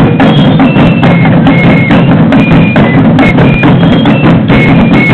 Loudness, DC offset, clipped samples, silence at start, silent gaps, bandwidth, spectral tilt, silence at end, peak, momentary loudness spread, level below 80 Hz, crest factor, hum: -4 LUFS; under 0.1%; 2%; 0 s; none; 5 kHz; -9 dB/octave; 0 s; 0 dBFS; 1 LU; -24 dBFS; 4 dB; none